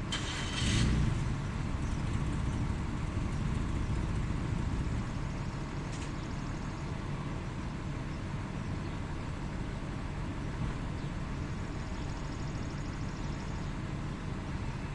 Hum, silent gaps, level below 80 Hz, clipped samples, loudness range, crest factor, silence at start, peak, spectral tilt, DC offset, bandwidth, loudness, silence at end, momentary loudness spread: none; none; -40 dBFS; under 0.1%; 5 LU; 18 dB; 0 s; -16 dBFS; -5.5 dB/octave; under 0.1%; 11.5 kHz; -36 LUFS; 0 s; 6 LU